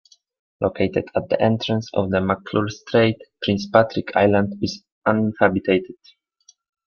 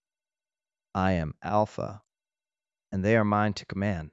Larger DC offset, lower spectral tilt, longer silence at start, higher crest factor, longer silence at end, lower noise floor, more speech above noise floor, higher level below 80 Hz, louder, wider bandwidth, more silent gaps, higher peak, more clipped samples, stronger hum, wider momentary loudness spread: neither; about the same, -6.5 dB/octave vs -7.5 dB/octave; second, 0.6 s vs 0.95 s; about the same, 20 dB vs 20 dB; first, 0.95 s vs 0.05 s; second, -58 dBFS vs under -90 dBFS; second, 38 dB vs over 63 dB; about the same, -56 dBFS vs -56 dBFS; first, -21 LUFS vs -28 LUFS; second, 7 kHz vs 8 kHz; first, 4.92-5.01 s vs none; first, -2 dBFS vs -10 dBFS; neither; neither; second, 8 LU vs 13 LU